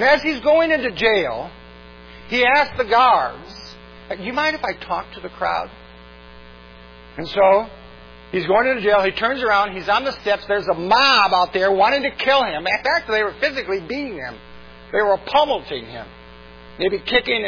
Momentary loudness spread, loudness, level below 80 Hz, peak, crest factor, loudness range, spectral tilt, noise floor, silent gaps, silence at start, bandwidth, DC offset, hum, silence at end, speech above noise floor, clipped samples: 18 LU; -18 LUFS; -46 dBFS; -2 dBFS; 18 dB; 7 LU; -4.5 dB/octave; -42 dBFS; none; 0 s; 5.4 kHz; under 0.1%; 60 Hz at -50 dBFS; 0 s; 24 dB; under 0.1%